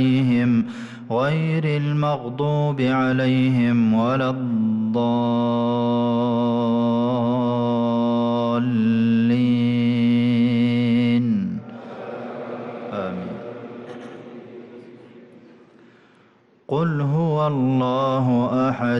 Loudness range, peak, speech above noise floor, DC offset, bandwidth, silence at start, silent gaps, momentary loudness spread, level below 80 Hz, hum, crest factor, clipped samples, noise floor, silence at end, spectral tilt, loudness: 14 LU; -12 dBFS; 36 dB; under 0.1%; 6.2 kHz; 0 s; none; 15 LU; -62 dBFS; none; 10 dB; under 0.1%; -56 dBFS; 0 s; -9 dB/octave; -20 LUFS